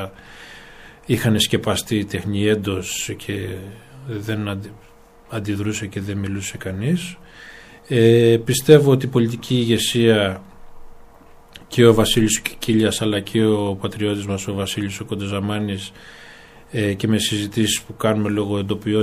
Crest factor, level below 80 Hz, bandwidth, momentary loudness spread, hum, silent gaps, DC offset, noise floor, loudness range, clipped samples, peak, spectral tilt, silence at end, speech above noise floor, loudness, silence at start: 20 dB; -46 dBFS; 15.5 kHz; 20 LU; none; none; under 0.1%; -45 dBFS; 10 LU; under 0.1%; 0 dBFS; -5 dB/octave; 0 s; 26 dB; -19 LUFS; 0 s